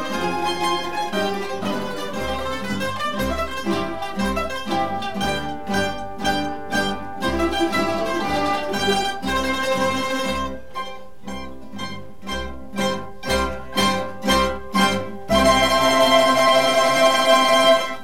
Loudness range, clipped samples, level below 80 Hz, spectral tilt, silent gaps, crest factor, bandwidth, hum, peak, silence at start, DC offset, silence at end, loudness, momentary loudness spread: 9 LU; under 0.1%; -40 dBFS; -3.5 dB/octave; none; 18 dB; 17 kHz; none; -2 dBFS; 0 s; 2%; 0 s; -20 LUFS; 14 LU